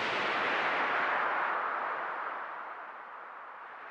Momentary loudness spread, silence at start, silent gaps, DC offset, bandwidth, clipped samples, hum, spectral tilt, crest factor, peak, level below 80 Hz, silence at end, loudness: 16 LU; 0 s; none; under 0.1%; 10.5 kHz; under 0.1%; none; -3 dB/octave; 16 dB; -18 dBFS; -80 dBFS; 0 s; -32 LUFS